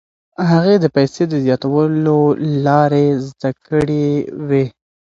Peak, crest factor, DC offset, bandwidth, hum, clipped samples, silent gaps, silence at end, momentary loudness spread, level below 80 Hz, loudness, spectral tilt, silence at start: 0 dBFS; 14 dB; under 0.1%; 7.8 kHz; none; under 0.1%; none; 0.45 s; 8 LU; -50 dBFS; -15 LUFS; -8 dB/octave; 0.4 s